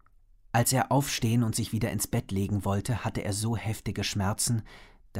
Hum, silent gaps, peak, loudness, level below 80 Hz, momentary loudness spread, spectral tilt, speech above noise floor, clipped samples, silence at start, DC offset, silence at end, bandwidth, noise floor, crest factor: none; none; -12 dBFS; -29 LUFS; -50 dBFS; 6 LU; -4.5 dB/octave; 29 dB; under 0.1%; 0.55 s; under 0.1%; 0 s; 16 kHz; -58 dBFS; 16 dB